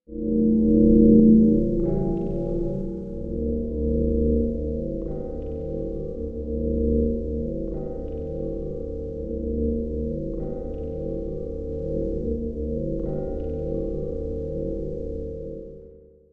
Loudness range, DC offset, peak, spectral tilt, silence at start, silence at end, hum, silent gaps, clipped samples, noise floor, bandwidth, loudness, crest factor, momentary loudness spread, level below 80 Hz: 10 LU; under 0.1%; -4 dBFS; -13 dB/octave; 0.1 s; 0.35 s; none; none; under 0.1%; -48 dBFS; 1.5 kHz; -25 LUFS; 20 dB; 14 LU; -32 dBFS